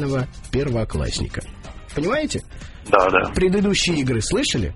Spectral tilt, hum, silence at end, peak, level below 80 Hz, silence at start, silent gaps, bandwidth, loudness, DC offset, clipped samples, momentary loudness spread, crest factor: -4.5 dB/octave; none; 0 s; 0 dBFS; -34 dBFS; 0 s; none; 11.5 kHz; -21 LUFS; under 0.1%; under 0.1%; 15 LU; 22 dB